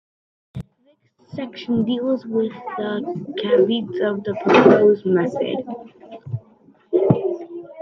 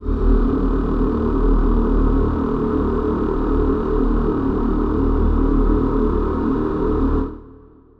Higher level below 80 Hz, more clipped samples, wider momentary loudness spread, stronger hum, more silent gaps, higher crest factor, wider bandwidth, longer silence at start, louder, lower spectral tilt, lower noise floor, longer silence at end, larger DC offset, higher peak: second, -60 dBFS vs -20 dBFS; neither; first, 22 LU vs 2 LU; neither; neither; first, 20 dB vs 14 dB; first, 6.6 kHz vs 4.2 kHz; first, 0.55 s vs 0 s; about the same, -19 LUFS vs -20 LUFS; second, -8 dB/octave vs -10.5 dB/octave; first, -61 dBFS vs -45 dBFS; second, 0 s vs 0.45 s; neither; first, 0 dBFS vs -4 dBFS